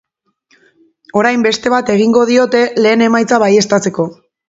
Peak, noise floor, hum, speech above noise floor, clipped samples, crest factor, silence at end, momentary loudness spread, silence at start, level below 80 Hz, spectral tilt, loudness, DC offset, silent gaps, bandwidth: 0 dBFS; -57 dBFS; none; 46 dB; under 0.1%; 12 dB; 0.35 s; 7 LU; 1.15 s; -56 dBFS; -4.5 dB/octave; -12 LUFS; under 0.1%; none; 8 kHz